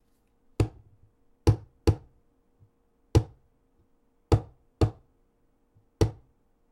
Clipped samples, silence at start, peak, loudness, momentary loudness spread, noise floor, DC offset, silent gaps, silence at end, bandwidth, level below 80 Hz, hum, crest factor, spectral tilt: under 0.1%; 0.6 s; -8 dBFS; -29 LUFS; 9 LU; -68 dBFS; under 0.1%; none; 0.6 s; 12.5 kHz; -38 dBFS; none; 22 dB; -7.5 dB/octave